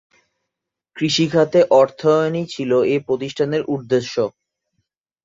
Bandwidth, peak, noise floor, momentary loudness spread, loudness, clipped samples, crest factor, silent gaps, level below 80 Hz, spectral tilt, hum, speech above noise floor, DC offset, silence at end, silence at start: 7.8 kHz; -2 dBFS; -82 dBFS; 9 LU; -18 LUFS; under 0.1%; 18 dB; none; -62 dBFS; -5.5 dB/octave; none; 65 dB; under 0.1%; 0.95 s; 0.95 s